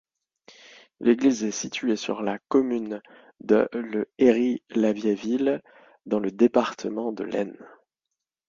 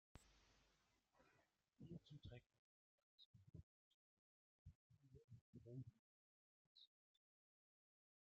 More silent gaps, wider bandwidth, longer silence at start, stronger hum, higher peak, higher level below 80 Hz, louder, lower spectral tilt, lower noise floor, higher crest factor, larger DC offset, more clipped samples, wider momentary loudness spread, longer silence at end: second, none vs 2.46-2.50 s, 2.59-3.18 s, 3.25-3.34 s, 3.63-4.65 s, 4.75-4.90 s, 5.24-5.28 s, 5.41-5.53 s, 5.99-6.75 s; about the same, 7.6 kHz vs 7 kHz; first, 1 s vs 0.15 s; neither; first, -6 dBFS vs -46 dBFS; first, -68 dBFS vs -82 dBFS; first, -25 LUFS vs -64 LUFS; second, -5 dB/octave vs -6.5 dB/octave; about the same, -85 dBFS vs -84 dBFS; about the same, 20 dB vs 22 dB; neither; neither; about the same, 9 LU vs 8 LU; second, 0.8 s vs 1.35 s